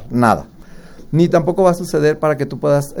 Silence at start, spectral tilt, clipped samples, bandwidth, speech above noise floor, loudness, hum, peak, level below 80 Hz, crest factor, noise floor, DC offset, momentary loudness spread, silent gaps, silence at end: 0 s; -7 dB/octave; under 0.1%; 18 kHz; 22 dB; -16 LUFS; none; 0 dBFS; -42 dBFS; 16 dB; -36 dBFS; under 0.1%; 5 LU; none; 0 s